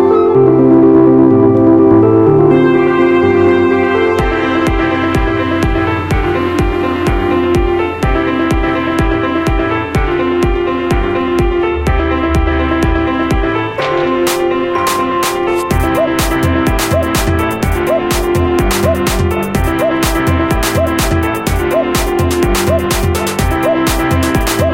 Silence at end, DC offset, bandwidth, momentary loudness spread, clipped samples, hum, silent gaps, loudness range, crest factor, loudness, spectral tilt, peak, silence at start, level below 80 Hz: 0 s; 0.3%; 17 kHz; 6 LU; under 0.1%; none; none; 5 LU; 12 dB; -12 LUFS; -6 dB/octave; 0 dBFS; 0 s; -22 dBFS